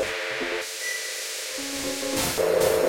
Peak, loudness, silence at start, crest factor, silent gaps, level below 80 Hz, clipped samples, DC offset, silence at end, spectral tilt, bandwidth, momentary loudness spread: -10 dBFS; -26 LUFS; 0 s; 16 dB; none; -54 dBFS; under 0.1%; under 0.1%; 0 s; -2 dB/octave; 16.5 kHz; 7 LU